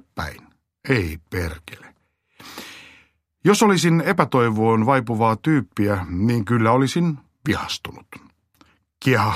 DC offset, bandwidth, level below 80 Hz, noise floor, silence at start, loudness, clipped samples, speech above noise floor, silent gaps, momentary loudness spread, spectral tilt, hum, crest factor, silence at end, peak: under 0.1%; 15 kHz; -46 dBFS; -61 dBFS; 0.15 s; -20 LUFS; under 0.1%; 42 dB; none; 20 LU; -6 dB/octave; none; 20 dB; 0 s; 0 dBFS